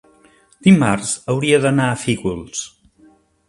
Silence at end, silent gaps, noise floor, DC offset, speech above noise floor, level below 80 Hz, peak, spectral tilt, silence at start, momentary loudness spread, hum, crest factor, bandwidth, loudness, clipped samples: 0.8 s; none; -52 dBFS; under 0.1%; 36 dB; -50 dBFS; 0 dBFS; -5.5 dB/octave; 0.65 s; 14 LU; none; 18 dB; 11.5 kHz; -17 LUFS; under 0.1%